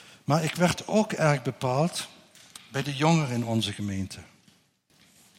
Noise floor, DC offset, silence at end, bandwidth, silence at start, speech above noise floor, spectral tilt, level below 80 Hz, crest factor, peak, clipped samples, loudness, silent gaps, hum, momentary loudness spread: -64 dBFS; under 0.1%; 1.15 s; 16.5 kHz; 0.3 s; 38 dB; -5.5 dB/octave; -64 dBFS; 18 dB; -10 dBFS; under 0.1%; -27 LUFS; none; none; 15 LU